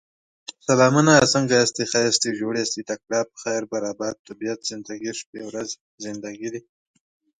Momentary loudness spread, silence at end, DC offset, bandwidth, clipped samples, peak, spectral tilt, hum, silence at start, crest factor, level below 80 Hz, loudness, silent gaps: 17 LU; 0.8 s; under 0.1%; 9.6 kHz; under 0.1%; 0 dBFS; -3.5 dB/octave; none; 0.5 s; 22 dB; -62 dBFS; -22 LUFS; 4.19-4.25 s, 5.26-5.33 s, 5.81-5.98 s